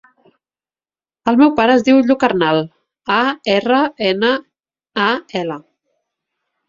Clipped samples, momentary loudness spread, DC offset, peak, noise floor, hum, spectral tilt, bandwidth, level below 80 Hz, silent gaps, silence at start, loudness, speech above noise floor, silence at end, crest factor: under 0.1%; 13 LU; under 0.1%; 0 dBFS; under -90 dBFS; none; -5.5 dB/octave; 7.6 kHz; -58 dBFS; none; 1.25 s; -15 LUFS; over 76 dB; 1.1 s; 16 dB